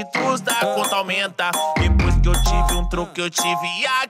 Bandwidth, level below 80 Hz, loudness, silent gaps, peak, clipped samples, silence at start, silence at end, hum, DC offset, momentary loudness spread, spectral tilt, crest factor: 16 kHz; -24 dBFS; -20 LUFS; none; -8 dBFS; under 0.1%; 0 s; 0 s; none; under 0.1%; 4 LU; -3.5 dB/octave; 12 dB